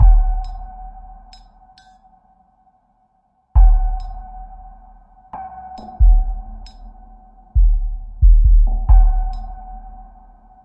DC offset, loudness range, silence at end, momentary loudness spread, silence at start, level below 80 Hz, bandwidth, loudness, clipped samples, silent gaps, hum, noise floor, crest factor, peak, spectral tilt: under 0.1%; 6 LU; 0.75 s; 23 LU; 0 s; -16 dBFS; 1.6 kHz; -18 LUFS; under 0.1%; none; none; -62 dBFS; 14 dB; -2 dBFS; -9 dB/octave